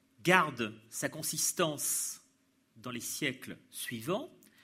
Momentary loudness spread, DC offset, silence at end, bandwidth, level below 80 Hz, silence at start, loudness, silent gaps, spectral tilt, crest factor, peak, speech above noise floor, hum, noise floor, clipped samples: 18 LU; under 0.1%; 0.35 s; 16 kHz; -76 dBFS; 0.2 s; -33 LUFS; none; -2.5 dB/octave; 28 dB; -8 dBFS; 38 dB; none; -71 dBFS; under 0.1%